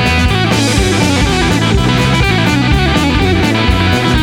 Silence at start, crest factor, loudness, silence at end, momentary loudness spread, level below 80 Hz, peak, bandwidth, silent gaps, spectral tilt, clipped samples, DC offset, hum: 0 s; 10 dB; -11 LUFS; 0 s; 1 LU; -20 dBFS; 0 dBFS; 17.5 kHz; none; -5 dB/octave; under 0.1%; under 0.1%; none